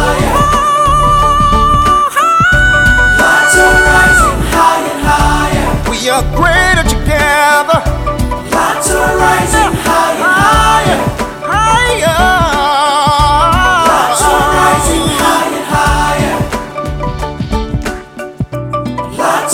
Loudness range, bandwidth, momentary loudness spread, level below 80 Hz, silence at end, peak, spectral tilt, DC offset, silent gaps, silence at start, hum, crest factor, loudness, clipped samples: 6 LU; 18 kHz; 11 LU; -20 dBFS; 0 s; 0 dBFS; -3.5 dB/octave; under 0.1%; none; 0 s; none; 10 dB; -9 LUFS; 0.2%